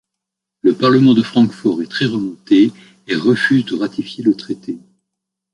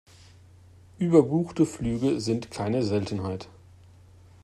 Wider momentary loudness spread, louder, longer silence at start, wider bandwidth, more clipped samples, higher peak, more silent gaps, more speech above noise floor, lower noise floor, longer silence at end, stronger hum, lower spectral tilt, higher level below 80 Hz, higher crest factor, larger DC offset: about the same, 11 LU vs 12 LU; first, -16 LUFS vs -26 LUFS; second, 0.65 s vs 1 s; about the same, 11 kHz vs 12 kHz; neither; first, 0 dBFS vs -6 dBFS; neither; first, 66 dB vs 27 dB; first, -81 dBFS vs -52 dBFS; second, 0.75 s vs 0.95 s; neither; about the same, -7 dB/octave vs -7 dB/octave; about the same, -58 dBFS vs -54 dBFS; second, 16 dB vs 22 dB; neither